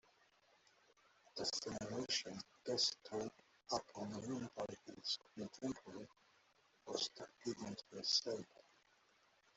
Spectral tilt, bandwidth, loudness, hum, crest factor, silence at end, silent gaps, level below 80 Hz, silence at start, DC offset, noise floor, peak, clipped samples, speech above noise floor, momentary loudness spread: -3 dB/octave; 8.2 kHz; -44 LUFS; none; 24 dB; 1.1 s; none; -80 dBFS; 1.35 s; under 0.1%; -75 dBFS; -22 dBFS; under 0.1%; 30 dB; 14 LU